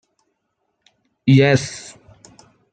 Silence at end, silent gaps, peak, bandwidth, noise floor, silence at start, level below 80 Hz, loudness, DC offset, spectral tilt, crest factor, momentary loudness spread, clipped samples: 0.9 s; none; -2 dBFS; 9.2 kHz; -72 dBFS; 1.25 s; -58 dBFS; -16 LUFS; under 0.1%; -6 dB/octave; 18 dB; 22 LU; under 0.1%